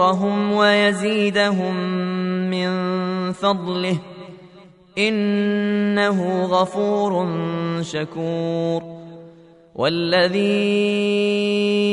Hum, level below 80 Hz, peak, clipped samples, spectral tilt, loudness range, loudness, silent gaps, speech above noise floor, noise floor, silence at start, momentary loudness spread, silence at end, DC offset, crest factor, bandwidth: none; -64 dBFS; -2 dBFS; under 0.1%; -6 dB/octave; 4 LU; -20 LUFS; none; 27 dB; -47 dBFS; 0 s; 8 LU; 0 s; under 0.1%; 18 dB; 11 kHz